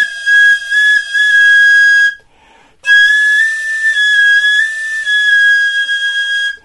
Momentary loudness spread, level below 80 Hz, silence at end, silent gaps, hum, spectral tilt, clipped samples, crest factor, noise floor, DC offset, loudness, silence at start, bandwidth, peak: 8 LU; -58 dBFS; 0.1 s; none; none; 4 dB/octave; under 0.1%; 10 dB; -46 dBFS; 0.2%; -8 LUFS; 0 s; 11.5 kHz; 0 dBFS